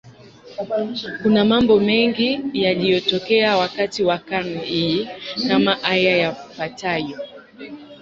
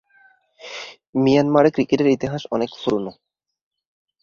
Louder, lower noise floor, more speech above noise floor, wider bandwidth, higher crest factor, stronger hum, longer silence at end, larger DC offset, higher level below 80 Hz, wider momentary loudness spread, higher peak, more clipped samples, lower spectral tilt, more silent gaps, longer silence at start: about the same, -19 LUFS vs -19 LUFS; second, -43 dBFS vs -56 dBFS; second, 24 dB vs 38 dB; about the same, 7.6 kHz vs 7.2 kHz; about the same, 18 dB vs 18 dB; neither; second, 0.05 s vs 1.1 s; neither; about the same, -54 dBFS vs -56 dBFS; about the same, 16 LU vs 18 LU; about the same, -2 dBFS vs -2 dBFS; neither; second, -5.5 dB/octave vs -7 dB/octave; second, none vs 1.09-1.13 s; second, 0.05 s vs 0.65 s